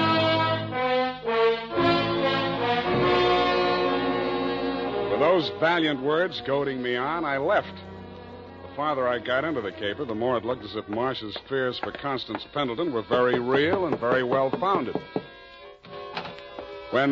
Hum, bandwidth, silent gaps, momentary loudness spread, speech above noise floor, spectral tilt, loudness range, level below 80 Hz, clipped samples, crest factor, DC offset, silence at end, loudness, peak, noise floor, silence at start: none; 7.4 kHz; none; 17 LU; 20 dB; -3 dB/octave; 5 LU; -54 dBFS; under 0.1%; 16 dB; under 0.1%; 0 s; -25 LUFS; -10 dBFS; -46 dBFS; 0 s